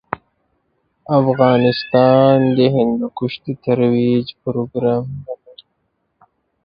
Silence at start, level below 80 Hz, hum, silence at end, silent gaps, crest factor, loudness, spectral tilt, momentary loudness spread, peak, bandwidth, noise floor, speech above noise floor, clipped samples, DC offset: 0.1 s; -54 dBFS; none; 1.3 s; none; 16 dB; -16 LUFS; -11 dB/octave; 17 LU; 0 dBFS; 5.4 kHz; -69 dBFS; 54 dB; under 0.1%; under 0.1%